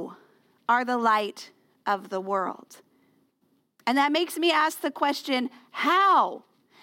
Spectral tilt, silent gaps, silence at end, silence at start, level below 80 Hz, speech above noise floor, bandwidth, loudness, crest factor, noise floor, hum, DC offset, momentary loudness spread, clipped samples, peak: -3 dB/octave; none; 0.45 s; 0 s; -80 dBFS; 45 dB; 17 kHz; -25 LUFS; 18 dB; -70 dBFS; none; under 0.1%; 14 LU; under 0.1%; -10 dBFS